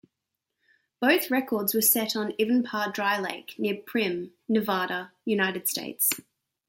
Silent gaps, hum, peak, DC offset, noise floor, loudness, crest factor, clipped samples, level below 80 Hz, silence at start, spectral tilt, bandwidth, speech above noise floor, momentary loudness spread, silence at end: none; none; -10 dBFS; under 0.1%; -84 dBFS; -26 LUFS; 18 dB; under 0.1%; -76 dBFS; 1 s; -3 dB/octave; 17 kHz; 57 dB; 9 LU; 0.5 s